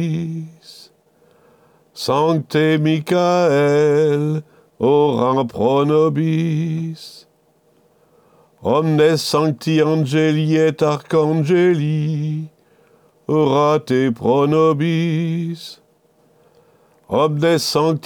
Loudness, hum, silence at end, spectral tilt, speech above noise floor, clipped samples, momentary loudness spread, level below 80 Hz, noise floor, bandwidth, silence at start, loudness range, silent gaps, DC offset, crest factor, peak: -17 LUFS; none; 0.05 s; -6.5 dB/octave; 41 dB; under 0.1%; 12 LU; -62 dBFS; -58 dBFS; 17.5 kHz; 0 s; 4 LU; none; under 0.1%; 14 dB; -4 dBFS